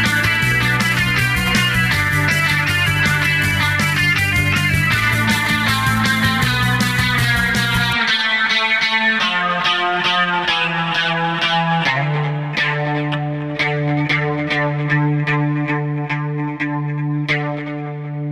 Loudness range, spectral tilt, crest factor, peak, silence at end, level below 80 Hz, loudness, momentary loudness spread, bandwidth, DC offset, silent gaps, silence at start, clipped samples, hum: 4 LU; -4.5 dB/octave; 12 dB; -4 dBFS; 0 s; -38 dBFS; -16 LUFS; 7 LU; 16 kHz; 0.2%; none; 0 s; under 0.1%; none